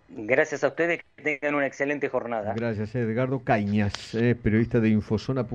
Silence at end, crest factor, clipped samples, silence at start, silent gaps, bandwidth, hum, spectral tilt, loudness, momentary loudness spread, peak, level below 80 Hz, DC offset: 0 s; 18 dB; under 0.1%; 0.1 s; none; 8.6 kHz; none; -7 dB/octave; -26 LUFS; 6 LU; -6 dBFS; -50 dBFS; under 0.1%